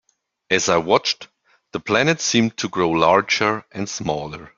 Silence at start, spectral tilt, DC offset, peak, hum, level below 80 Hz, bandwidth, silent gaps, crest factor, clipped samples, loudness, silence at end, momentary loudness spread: 0.5 s; -3.5 dB/octave; under 0.1%; 0 dBFS; none; -56 dBFS; 7.6 kHz; none; 20 dB; under 0.1%; -19 LUFS; 0.1 s; 11 LU